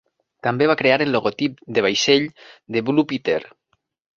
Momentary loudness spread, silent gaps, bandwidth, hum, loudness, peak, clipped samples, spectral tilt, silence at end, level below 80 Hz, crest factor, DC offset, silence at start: 9 LU; none; 7.6 kHz; none; -20 LUFS; -2 dBFS; under 0.1%; -4.5 dB/octave; 0.7 s; -62 dBFS; 20 dB; under 0.1%; 0.45 s